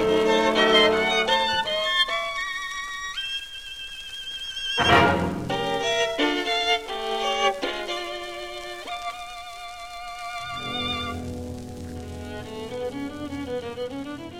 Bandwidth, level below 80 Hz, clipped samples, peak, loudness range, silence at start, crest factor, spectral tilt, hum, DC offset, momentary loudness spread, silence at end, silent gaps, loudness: 16 kHz; -48 dBFS; under 0.1%; -4 dBFS; 10 LU; 0 s; 22 dB; -3.5 dB/octave; none; 0.3%; 17 LU; 0 s; none; -24 LUFS